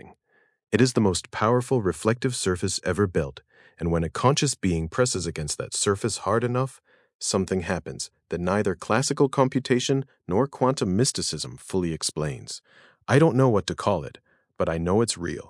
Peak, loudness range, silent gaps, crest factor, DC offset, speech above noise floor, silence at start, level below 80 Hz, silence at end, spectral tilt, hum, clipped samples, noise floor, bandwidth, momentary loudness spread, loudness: -4 dBFS; 2 LU; 7.15-7.19 s; 22 dB; under 0.1%; 42 dB; 0.05 s; -52 dBFS; 0.05 s; -5 dB/octave; none; under 0.1%; -66 dBFS; 12 kHz; 9 LU; -25 LUFS